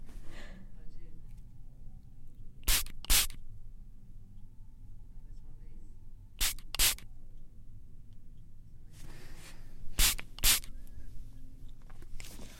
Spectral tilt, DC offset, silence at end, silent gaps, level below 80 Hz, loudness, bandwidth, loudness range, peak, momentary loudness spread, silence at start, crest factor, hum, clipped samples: 0 dB/octave; under 0.1%; 0 s; none; -40 dBFS; -30 LUFS; 16.5 kHz; 5 LU; -12 dBFS; 27 LU; 0 s; 24 dB; none; under 0.1%